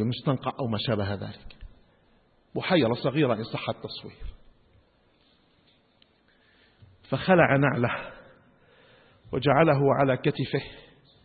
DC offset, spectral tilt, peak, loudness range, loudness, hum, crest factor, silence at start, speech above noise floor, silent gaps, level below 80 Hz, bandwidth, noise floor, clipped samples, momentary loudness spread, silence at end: under 0.1%; -11 dB/octave; -6 dBFS; 13 LU; -25 LUFS; none; 22 dB; 0 s; 39 dB; none; -54 dBFS; 4.8 kHz; -64 dBFS; under 0.1%; 19 LU; 0.45 s